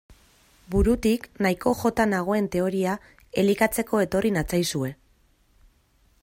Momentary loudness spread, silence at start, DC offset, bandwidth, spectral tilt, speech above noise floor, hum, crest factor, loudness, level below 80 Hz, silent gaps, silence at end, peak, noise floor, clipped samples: 7 LU; 0.1 s; under 0.1%; 16.5 kHz; -5.5 dB/octave; 39 dB; none; 18 dB; -24 LUFS; -40 dBFS; none; 1.3 s; -8 dBFS; -62 dBFS; under 0.1%